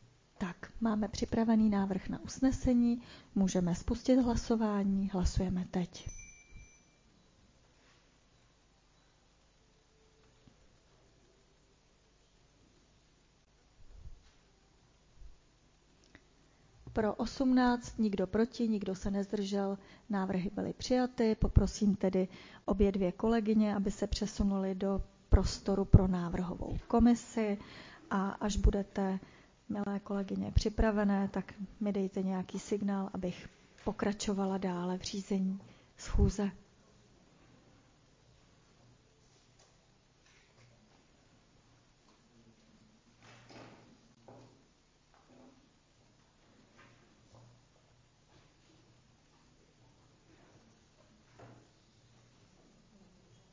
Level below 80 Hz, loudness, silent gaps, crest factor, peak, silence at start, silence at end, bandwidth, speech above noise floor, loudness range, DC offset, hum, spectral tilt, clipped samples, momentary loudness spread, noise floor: -44 dBFS; -33 LUFS; none; 28 dB; -8 dBFS; 0.4 s; 2 s; 7.6 kHz; 36 dB; 7 LU; under 0.1%; none; -6.5 dB/octave; under 0.1%; 13 LU; -68 dBFS